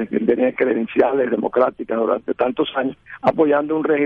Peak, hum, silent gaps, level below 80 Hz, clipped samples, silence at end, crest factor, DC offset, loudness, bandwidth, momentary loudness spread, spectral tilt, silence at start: -4 dBFS; none; none; -58 dBFS; under 0.1%; 0 s; 16 dB; under 0.1%; -19 LUFS; 4.9 kHz; 4 LU; -8.5 dB/octave; 0 s